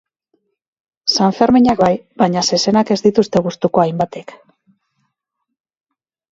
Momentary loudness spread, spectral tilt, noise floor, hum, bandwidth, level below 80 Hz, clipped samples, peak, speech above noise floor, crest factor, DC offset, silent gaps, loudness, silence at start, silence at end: 8 LU; -5 dB/octave; -77 dBFS; none; 8 kHz; -50 dBFS; under 0.1%; 0 dBFS; 62 dB; 16 dB; under 0.1%; none; -15 LUFS; 1.05 s; 2.1 s